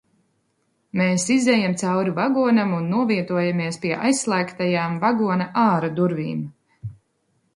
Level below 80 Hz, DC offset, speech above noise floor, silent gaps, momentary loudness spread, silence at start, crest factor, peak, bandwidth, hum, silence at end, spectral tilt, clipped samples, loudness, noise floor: -62 dBFS; under 0.1%; 48 dB; none; 11 LU; 0.95 s; 16 dB; -6 dBFS; 11.5 kHz; none; 0.65 s; -5.5 dB/octave; under 0.1%; -21 LUFS; -69 dBFS